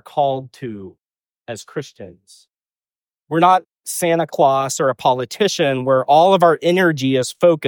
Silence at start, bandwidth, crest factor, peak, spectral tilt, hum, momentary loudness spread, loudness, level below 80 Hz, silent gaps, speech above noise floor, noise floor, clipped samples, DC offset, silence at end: 0.15 s; 19 kHz; 16 dB; -2 dBFS; -4.5 dB/octave; none; 18 LU; -16 LUFS; -66 dBFS; none; over 73 dB; under -90 dBFS; under 0.1%; under 0.1%; 0 s